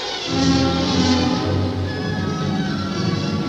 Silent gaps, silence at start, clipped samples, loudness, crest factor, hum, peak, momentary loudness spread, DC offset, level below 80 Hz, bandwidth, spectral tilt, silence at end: none; 0 s; under 0.1%; -20 LUFS; 14 dB; none; -6 dBFS; 6 LU; under 0.1%; -40 dBFS; 9.4 kHz; -5.5 dB/octave; 0 s